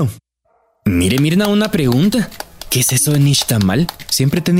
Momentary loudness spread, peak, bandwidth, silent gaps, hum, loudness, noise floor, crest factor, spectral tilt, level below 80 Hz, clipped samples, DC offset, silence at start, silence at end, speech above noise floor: 8 LU; -4 dBFS; 16.5 kHz; none; none; -15 LUFS; -60 dBFS; 12 dB; -4.5 dB/octave; -40 dBFS; under 0.1%; under 0.1%; 0 s; 0 s; 47 dB